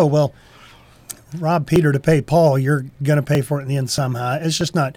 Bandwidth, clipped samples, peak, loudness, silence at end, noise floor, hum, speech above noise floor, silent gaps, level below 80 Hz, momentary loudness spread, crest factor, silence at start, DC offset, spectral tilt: 16 kHz; under 0.1%; -6 dBFS; -18 LUFS; 0.05 s; -46 dBFS; none; 28 dB; none; -46 dBFS; 8 LU; 12 dB; 0 s; under 0.1%; -6 dB/octave